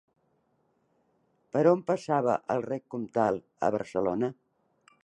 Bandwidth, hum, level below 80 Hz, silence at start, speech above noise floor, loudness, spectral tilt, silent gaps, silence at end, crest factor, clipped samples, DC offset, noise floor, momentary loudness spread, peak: 9.6 kHz; none; -68 dBFS; 1.55 s; 44 dB; -29 LUFS; -7.5 dB/octave; none; 0.7 s; 20 dB; under 0.1%; under 0.1%; -72 dBFS; 9 LU; -10 dBFS